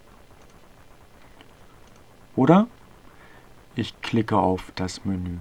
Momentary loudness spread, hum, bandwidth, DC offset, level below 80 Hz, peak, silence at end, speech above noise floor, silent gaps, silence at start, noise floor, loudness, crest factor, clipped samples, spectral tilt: 14 LU; none; 12.5 kHz; 0.2%; -52 dBFS; -2 dBFS; 0 s; 29 dB; none; 2.35 s; -51 dBFS; -24 LUFS; 24 dB; under 0.1%; -7 dB/octave